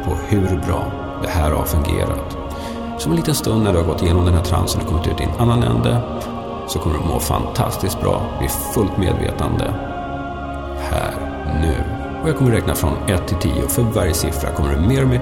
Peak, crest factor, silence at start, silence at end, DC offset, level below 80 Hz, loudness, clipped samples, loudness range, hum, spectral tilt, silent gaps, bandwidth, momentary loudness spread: -4 dBFS; 16 dB; 0 s; 0 s; under 0.1%; -26 dBFS; -19 LUFS; under 0.1%; 4 LU; none; -6 dB/octave; none; 17.5 kHz; 10 LU